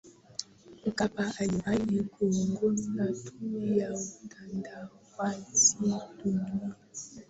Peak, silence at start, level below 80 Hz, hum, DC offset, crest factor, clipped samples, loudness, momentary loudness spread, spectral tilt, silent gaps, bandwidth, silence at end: -10 dBFS; 0.05 s; -62 dBFS; none; under 0.1%; 20 dB; under 0.1%; -30 LUFS; 16 LU; -4 dB/octave; none; 8.2 kHz; 0.05 s